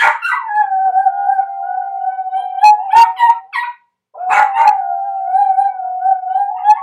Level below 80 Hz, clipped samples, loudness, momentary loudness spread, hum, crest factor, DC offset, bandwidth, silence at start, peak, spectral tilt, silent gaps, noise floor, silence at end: -62 dBFS; under 0.1%; -14 LUFS; 11 LU; none; 14 dB; under 0.1%; 12.5 kHz; 0 s; 0 dBFS; 0.5 dB/octave; none; -37 dBFS; 0 s